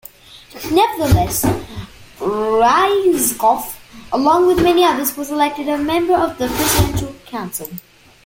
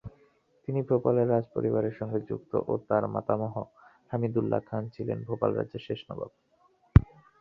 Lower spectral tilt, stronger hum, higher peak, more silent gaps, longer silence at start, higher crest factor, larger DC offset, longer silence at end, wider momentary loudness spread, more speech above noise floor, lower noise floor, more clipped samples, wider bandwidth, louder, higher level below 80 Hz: second, -4.5 dB/octave vs -11 dB/octave; neither; about the same, -2 dBFS vs -4 dBFS; neither; first, 0.3 s vs 0.05 s; second, 16 dB vs 26 dB; neither; about the same, 0.45 s vs 0.35 s; about the same, 15 LU vs 16 LU; second, 25 dB vs 35 dB; second, -40 dBFS vs -65 dBFS; neither; first, 17 kHz vs 5.4 kHz; first, -16 LUFS vs -29 LUFS; first, -34 dBFS vs -40 dBFS